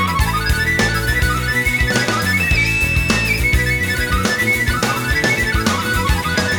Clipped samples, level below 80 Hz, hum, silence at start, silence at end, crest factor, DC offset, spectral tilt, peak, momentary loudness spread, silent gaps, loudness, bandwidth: under 0.1%; -24 dBFS; none; 0 s; 0 s; 16 dB; under 0.1%; -4 dB/octave; -2 dBFS; 3 LU; none; -16 LUFS; over 20 kHz